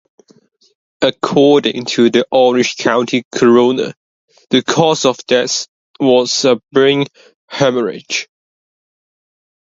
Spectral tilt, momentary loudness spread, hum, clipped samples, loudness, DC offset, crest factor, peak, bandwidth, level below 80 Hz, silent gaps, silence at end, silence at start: -4 dB/octave; 10 LU; none; under 0.1%; -13 LUFS; under 0.1%; 14 dB; 0 dBFS; 7.8 kHz; -60 dBFS; 3.25-3.31 s, 3.97-4.28 s, 5.68-5.94 s, 7.35-7.48 s; 1.5 s; 1 s